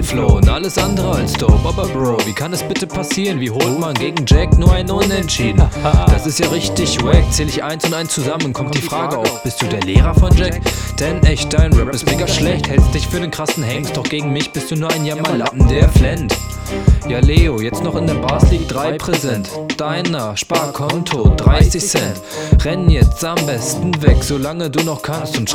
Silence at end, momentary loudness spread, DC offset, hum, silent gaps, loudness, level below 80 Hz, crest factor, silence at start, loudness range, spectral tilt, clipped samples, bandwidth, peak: 0 s; 7 LU; 0.2%; none; none; -15 LUFS; -18 dBFS; 14 dB; 0 s; 3 LU; -5 dB/octave; 0.2%; 16.5 kHz; 0 dBFS